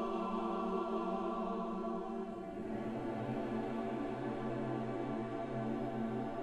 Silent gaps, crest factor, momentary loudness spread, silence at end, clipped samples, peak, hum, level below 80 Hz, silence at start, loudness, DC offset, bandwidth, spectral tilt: none; 14 dB; 4 LU; 0 s; under 0.1%; -26 dBFS; none; -60 dBFS; 0 s; -40 LUFS; under 0.1%; 10.5 kHz; -8 dB/octave